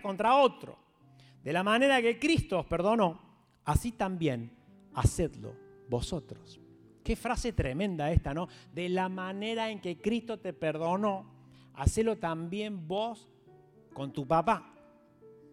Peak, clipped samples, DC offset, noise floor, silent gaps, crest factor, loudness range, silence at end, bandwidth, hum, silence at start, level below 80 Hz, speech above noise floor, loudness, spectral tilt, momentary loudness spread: -10 dBFS; under 0.1%; under 0.1%; -59 dBFS; none; 20 dB; 6 LU; 0.2 s; 16 kHz; none; 0 s; -44 dBFS; 29 dB; -31 LUFS; -5.5 dB/octave; 16 LU